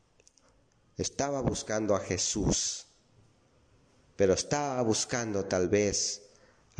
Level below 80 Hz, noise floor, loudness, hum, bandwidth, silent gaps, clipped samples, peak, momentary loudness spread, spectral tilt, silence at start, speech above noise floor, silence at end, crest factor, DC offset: -52 dBFS; -66 dBFS; -30 LUFS; none; 10.5 kHz; none; under 0.1%; -12 dBFS; 8 LU; -3.5 dB/octave; 1 s; 37 dB; 0.6 s; 20 dB; under 0.1%